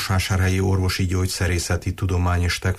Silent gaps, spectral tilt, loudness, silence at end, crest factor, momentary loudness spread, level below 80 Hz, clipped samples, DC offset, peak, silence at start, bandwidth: none; -5 dB/octave; -22 LUFS; 0 s; 10 dB; 4 LU; -34 dBFS; under 0.1%; under 0.1%; -10 dBFS; 0 s; 15 kHz